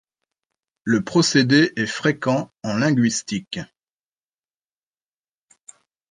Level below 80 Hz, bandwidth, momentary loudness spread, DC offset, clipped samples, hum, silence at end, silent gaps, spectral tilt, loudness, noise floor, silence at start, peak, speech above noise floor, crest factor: -62 dBFS; 10 kHz; 16 LU; under 0.1%; under 0.1%; none; 2.45 s; none; -4.5 dB/octave; -20 LUFS; under -90 dBFS; 0.85 s; -4 dBFS; over 70 dB; 20 dB